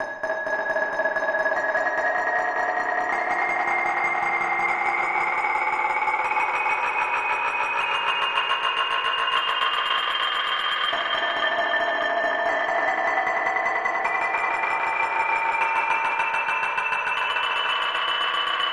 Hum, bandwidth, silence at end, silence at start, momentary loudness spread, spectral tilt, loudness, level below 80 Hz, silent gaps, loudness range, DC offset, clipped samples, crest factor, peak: none; 12.5 kHz; 0 s; 0 s; 1 LU; -1.5 dB/octave; -23 LUFS; -66 dBFS; none; 1 LU; under 0.1%; under 0.1%; 16 dB; -8 dBFS